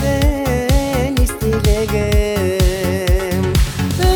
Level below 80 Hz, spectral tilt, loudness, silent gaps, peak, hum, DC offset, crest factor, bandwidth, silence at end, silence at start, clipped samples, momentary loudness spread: -18 dBFS; -5.5 dB/octave; -17 LUFS; none; 0 dBFS; none; under 0.1%; 14 dB; over 20 kHz; 0 s; 0 s; under 0.1%; 1 LU